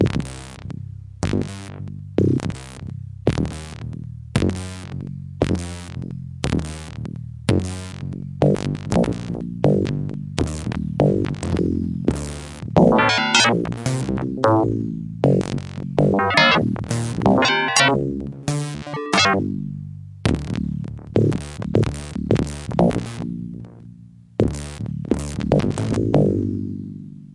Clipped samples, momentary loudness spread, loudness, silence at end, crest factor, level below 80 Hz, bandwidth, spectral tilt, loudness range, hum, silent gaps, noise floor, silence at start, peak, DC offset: under 0.1%; 17 LU; -21 LUFS; 0 s; 20 dB; -40 dBFS; 11.5 kHz; -5.5 dB/octave; 8 LU; none; none; -44 dBFS; 0 s; 0 dBFS; under 0.1%